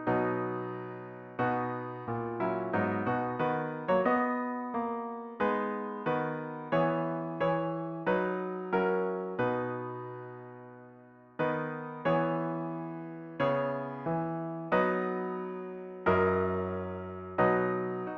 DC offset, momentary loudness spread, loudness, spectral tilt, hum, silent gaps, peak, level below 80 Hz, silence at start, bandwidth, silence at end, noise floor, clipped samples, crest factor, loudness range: under 0.1%; 12 LU; -32 LUFS; -9.5 dB/octave; none; none; -12 dBFS; -66 dBFS; 0 s; 6.2 kHz; 0 s; -55 dBFS; under 0.1%; 20 dB; 4 LU